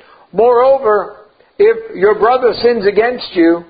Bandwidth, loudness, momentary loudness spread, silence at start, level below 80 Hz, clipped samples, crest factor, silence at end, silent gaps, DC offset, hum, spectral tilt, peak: 5 kHz; -12 LUFS; 6 LU; 0.35 s; -48 dBFS; under 0.1%; 12 dB; 0.05 s; none; under 0.1%; none; -9.5 dB/octave; 0 dBFS